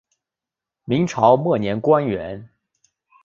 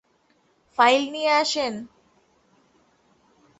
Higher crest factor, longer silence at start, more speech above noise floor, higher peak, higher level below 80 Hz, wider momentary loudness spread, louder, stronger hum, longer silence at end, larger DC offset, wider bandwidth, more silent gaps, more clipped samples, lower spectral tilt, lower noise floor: about the same, 20 dB vs 22 dB; about the same, 0.9 s vs 0.8 s; first, 69 dB vs 43 dB; about the same, -2 dBFS vs -4 dBFS; first, -54 dBFS vs -70 dBFS; about the same, 14 LU vs 15 LU; about the same, -19 LUFS vs -21 LUFS; neither; second, 0.8 s vs 1.75 s; neither; second, 7.6 kHz vs 8.4 kHz; neither; neither; first, -7 dB/octave vs -2 dB/octave; first, -87 dBFS vs -65 dBFS